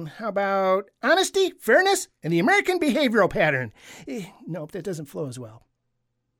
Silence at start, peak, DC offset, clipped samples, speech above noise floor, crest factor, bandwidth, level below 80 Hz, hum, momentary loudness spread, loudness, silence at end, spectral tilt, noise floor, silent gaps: 0 s; -8 dBFS; under 0.1%; under 0.1%; 52 dB; 16 dB; 17 kHz; -56 dBFS; none; 16 LU; -22 LUFS; 0.85 s; -4 dB/octave; -75 dBFS; none